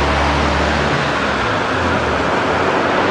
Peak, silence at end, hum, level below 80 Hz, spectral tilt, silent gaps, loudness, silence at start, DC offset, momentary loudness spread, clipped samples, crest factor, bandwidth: -2 dBFS; 0 s; none; -28 dBFS; -5 dB/octave; none; -16 LUFS; 0 s; under 0.1%; 2 LU; under 0.1%; 12 dB; 10.5 kHz